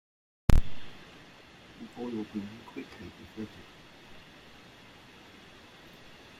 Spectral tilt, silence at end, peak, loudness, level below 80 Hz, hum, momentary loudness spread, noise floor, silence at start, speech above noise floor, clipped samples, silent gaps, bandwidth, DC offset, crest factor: -6.5 dB/octave; 2.95 s; -6 dBFS; -36 LUFS; -36 dBFS; none; 21 LU; -53 dBFS; 0.5 s; 13 dB; under 0.1%; none; 13.5 kHz; under 0.1%; 26 dB